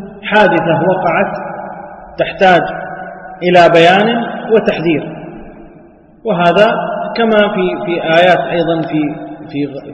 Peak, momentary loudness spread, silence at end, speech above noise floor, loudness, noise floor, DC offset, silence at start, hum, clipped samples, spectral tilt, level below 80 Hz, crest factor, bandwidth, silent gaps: 0 dBFS; 18 LU; 0 s; 30 dB; -12 LUFS; -41 dBFS; under 0.1%; 0 s; none; 0.2%; -6.5 dB/octave; -46 dBFS; 12 dB; 8.6 kHz; none